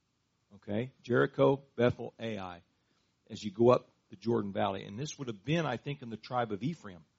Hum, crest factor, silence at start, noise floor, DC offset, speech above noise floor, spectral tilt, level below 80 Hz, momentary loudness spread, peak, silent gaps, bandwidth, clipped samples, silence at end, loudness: none; 22 dB; 0.55 s; -78 dBFS; under 0.1%; 45 dB; -5.5 dB/octave; -68 dBFS; 15 LU; -12 dBFS; none; 7.6 kHz; under 0.1%; 0.2 s; -33 LUFS